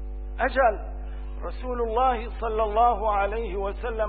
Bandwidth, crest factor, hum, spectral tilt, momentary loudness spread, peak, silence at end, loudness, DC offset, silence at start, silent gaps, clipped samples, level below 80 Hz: 4.7 kHz; 16 dB; 50 Hz at -35 dBFS; -10 dB/octave; 15 LU; -10 dBFS; 0 s; -25 LUFS; 0.3%; 0 s; none; under 0.1%; -34 dBFS